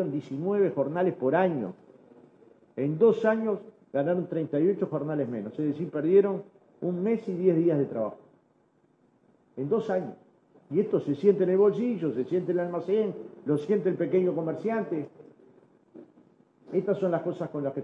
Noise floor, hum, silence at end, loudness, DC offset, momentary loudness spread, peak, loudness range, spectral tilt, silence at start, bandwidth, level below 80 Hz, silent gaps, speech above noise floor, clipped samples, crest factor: -66 dBFS; none; 0 s; -27 LUFS; under 0.1%; 11 LU; -10 dBFS; 5 LU; -9.5 dB/octave; 0 s; 6.4 kHz; -78 dBFS; none; 40 dB; under 0.1%; 18 dB